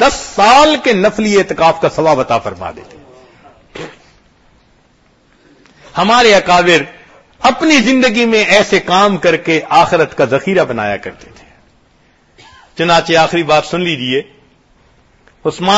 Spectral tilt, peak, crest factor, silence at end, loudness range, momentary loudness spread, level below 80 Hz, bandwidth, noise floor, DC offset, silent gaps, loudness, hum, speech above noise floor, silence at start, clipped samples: -4 dB/octave; 0 dBFS; 12 dB; 0 s; 7 LU; 16 LU; -42 dBFS; 11 kHz; -51 dBFS; under 0.1%; none; -11 LUFS; none; 40 dB; 0 s; 0.1%